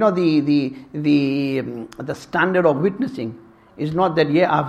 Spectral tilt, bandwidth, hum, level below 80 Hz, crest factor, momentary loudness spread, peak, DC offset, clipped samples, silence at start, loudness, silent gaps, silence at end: -7.5 dB/octave; 9 kHz; none; -58 dBFS; 18 dB; 14 LU; -2 dBFS; under 0.1%; under 0.1%; 0 s; -20 LUFS; none; 0 s